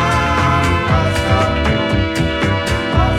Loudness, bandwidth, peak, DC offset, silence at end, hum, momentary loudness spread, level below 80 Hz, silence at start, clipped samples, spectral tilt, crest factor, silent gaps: -15 LUFS; 14 kHz; 0 dBFS; under 0.1%; 0 s; none; 3 LU; -24 dBFS; 0 s; under 0.1%; -5.5 dB/octave; 14 dB; none